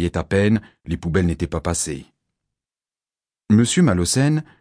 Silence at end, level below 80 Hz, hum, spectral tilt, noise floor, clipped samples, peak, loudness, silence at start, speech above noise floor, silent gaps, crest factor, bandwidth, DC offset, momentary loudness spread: 0.2 s; -40 dBFS; none; -5.5 dB/octave; under -90 dBFS; under 0.1%; -4 dBFS; -20 LUFS; 0 s; over 71 dB; none; 18 dB; 11 kHz; under 0.1%; 10 LU